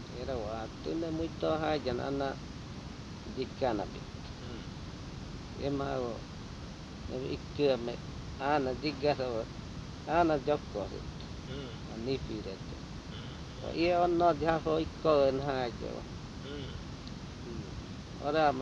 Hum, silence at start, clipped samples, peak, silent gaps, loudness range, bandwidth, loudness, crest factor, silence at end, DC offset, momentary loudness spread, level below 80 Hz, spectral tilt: none; 0 s; under 0.1%; -14 dBFS; none; 9 LU; 10.5 kHz; -35 LUFS; 20 dB; 0 s; under 0.1%; 16 LU; -50 dBFS; -6.5 dB/octave